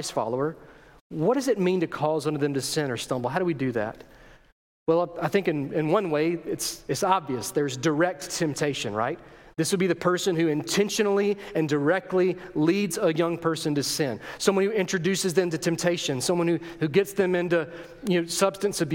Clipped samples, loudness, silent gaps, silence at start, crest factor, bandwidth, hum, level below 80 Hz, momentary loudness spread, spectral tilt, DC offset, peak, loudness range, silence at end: under 0.1%; -26 LUFS; 1.01-1.10 s, 4.52-4.86 s; 0 s; 20 dB; 17 kHz; none; -60 dBFS; 5 LU; -4.5 dB/octave; under 0.1%; -6 dBFS; 3 LU; 0 s